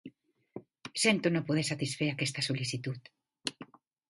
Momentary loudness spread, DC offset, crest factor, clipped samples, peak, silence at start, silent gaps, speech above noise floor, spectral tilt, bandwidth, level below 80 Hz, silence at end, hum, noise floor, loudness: 22 LU; under 0.1%; 24 dB; under 0.1%; -10 dBFS; 0.05 s; none; 24 dB; -4 dB/octave; 11.5 kHz; -72 dBFS; 0.45 s; none; -55 dBFS; -32 LUFS